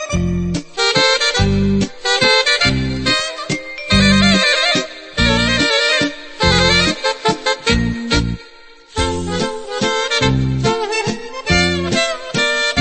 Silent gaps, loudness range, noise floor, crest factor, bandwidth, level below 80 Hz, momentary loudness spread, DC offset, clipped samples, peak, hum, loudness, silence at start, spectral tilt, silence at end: none; 5 LU; -41 dBFS; 16 dB; 8.8 kHz; -30 dBFS; 10 LU; under 0.1%; under 0.1%; 0 dBFS; none; -15 LUFS; 0 s; -4 dB/octave; 0 s